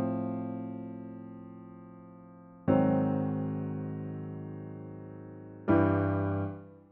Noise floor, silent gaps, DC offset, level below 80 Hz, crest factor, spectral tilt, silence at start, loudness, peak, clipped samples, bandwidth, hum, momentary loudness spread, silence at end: -52 dBFS; none; under 0.1%; -64 dBFS; 20 dB; -9.5 dB/octave; 0 s; -32 LUFS; -12 dBFS; under 0.1%; 3.9 kHz; none; 22 LU; 0.1 s